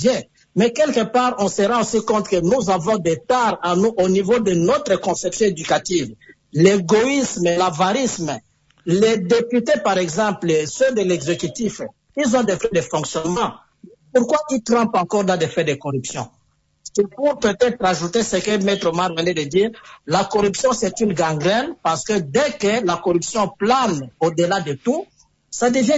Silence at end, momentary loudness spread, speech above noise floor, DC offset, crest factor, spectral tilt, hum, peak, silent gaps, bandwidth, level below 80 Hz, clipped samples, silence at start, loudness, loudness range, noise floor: 0 s; 7 LU; 36 dB; under 0.1%; 16 dB; -4.5 dB/octave; none; -2 dBFS; none; 8 kHz; -52 dBFS; under 0.1%; 0 s; -19 LUFS; 3 LU; -54 dBFS